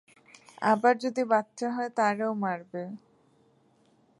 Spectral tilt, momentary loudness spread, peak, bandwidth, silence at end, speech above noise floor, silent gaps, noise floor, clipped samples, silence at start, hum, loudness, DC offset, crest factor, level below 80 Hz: -5.5 dB/octave; 15 LU; -10 dBFS; 11.5 kHz; 1.2 s; 37 dB; none; -65 dBFS; under 0.1%; 0.6 s; none; -28 LUFS; under 0.1%; 20 dB; -82 dBFS